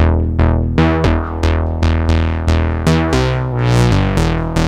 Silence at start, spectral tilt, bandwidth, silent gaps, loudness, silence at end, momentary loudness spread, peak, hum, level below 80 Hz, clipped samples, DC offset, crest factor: 0 s; -7 dB/octave; 11.5 kHz; none; -15 LUFS; 0 s; 3 LU; 0 dBFS; none; -20 dBFS; under 0.1%; under 0.1%; 14 dB